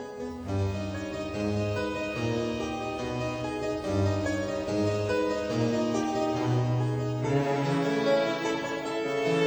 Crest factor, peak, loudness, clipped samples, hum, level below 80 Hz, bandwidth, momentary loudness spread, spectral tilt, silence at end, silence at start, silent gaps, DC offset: 14 dB; -14 dBFS; -29 LUFS; under 0.1%; none; -52 dBFS; over 20 kHz; 6 LU; -6.5 dB/octave; 0 s; 0 s; none; under 0.1%